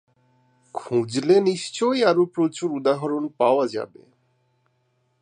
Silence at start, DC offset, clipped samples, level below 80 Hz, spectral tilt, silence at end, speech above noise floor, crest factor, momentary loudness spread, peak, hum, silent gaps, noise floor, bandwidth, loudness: 0.75 s; under 0.1%; under 0.1%; -74 dBFS; -5.5 dB/octave; 1.35 s; 47 dB; 20 dB; 12 LU; -4 dBFS; none; none; -68 dBFS; 10 kHz; -22 LUFS